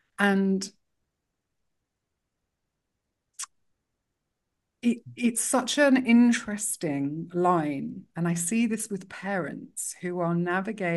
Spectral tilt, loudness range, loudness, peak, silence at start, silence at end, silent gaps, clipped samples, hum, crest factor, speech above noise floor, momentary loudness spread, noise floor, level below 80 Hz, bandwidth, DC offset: -4.5 dB/octave; 11 LU; -26 LUFS; -6 dBFS; 0.2 s; 0 s; none; under 0.1%; none; 22 dB; 57 dB; 14 LU; -82 dBFS; -74 dBFS; 12 kHz; under 0.1%